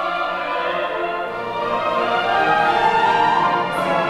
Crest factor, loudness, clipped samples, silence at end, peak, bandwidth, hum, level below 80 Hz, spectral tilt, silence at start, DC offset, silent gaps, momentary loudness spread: 14 dB; -19 LUFS; under 0.1%; 0 s; -4 dBFS; 14 kHz; none; -52 dBFS; -4.5 dB/octave; 0 s; under 0.1%; none; 8 LU